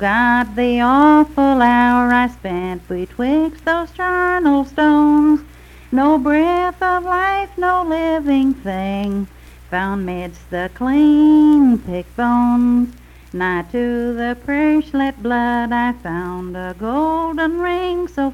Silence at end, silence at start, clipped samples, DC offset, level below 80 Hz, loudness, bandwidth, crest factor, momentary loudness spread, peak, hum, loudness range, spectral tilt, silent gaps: 0 s; 0 s; under 0.1%; under 0.1%; -40 dBFS; -16 LUFS; 12 kHz; 14 dB; 13 LU; -2 dBFS; 60 Hz at -50 dBFS; 5 LU; -7 dB/octave; none